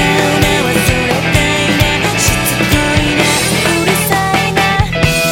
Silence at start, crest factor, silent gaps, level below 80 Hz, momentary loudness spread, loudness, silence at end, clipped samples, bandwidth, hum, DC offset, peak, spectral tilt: 0 s; 12 dB; none; -26 dBFS; 1 LU; -11 LUFS; 0 s; under 0.1%; 17 kHz; none; under 0.1%; 0 dBFS; -4 dB/octave